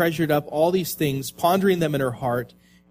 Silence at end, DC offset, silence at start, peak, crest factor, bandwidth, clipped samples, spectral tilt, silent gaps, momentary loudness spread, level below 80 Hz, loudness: 0.45 s; under 0.1%; 0 s; -6 dBFS; 16 dB; 15.5 kHz; under 0.1%; -5.5 dB/octave; none; 6 LU; -56 dBFS; -23 LUFS